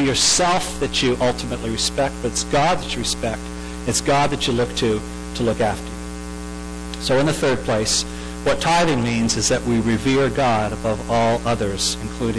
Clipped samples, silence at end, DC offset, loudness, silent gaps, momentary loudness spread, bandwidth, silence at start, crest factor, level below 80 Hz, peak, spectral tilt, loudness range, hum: under 0.1%; 0 s; under 0.1%; -20 LUFS; none; 12 LU; 11 kHz; 0 s; 12 dB; -34 dBFS; -8 dBFS; -3.5 dB/octave; 3 LU; none